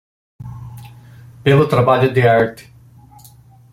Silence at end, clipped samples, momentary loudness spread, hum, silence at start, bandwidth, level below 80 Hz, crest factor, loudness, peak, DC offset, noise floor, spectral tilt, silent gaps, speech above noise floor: 1.2 s; under 0.1%; 23 LU; none; 0.4 s; 15.5 kHz; -48 dBFS; 16 dB; -14 LUFS; -2 dBFS; under 0.1%; -45 dBFS; -7.5 dB/octave; none; 32 dB